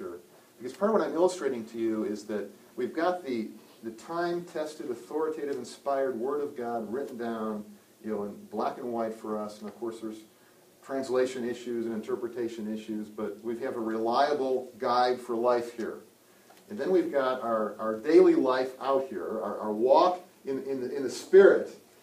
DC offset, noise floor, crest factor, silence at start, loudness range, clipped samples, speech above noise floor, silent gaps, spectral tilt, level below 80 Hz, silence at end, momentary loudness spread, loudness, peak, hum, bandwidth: under 0.1%; -59 dBFS; 22 dB; 0 s; 9 LU; under 0.1%; 30 dB; none; -5.5 dB/octave; -76 dBFS; 0.25 s; 16 LU; -29 LUFS; -6 dBFS; none; 15.5 kHz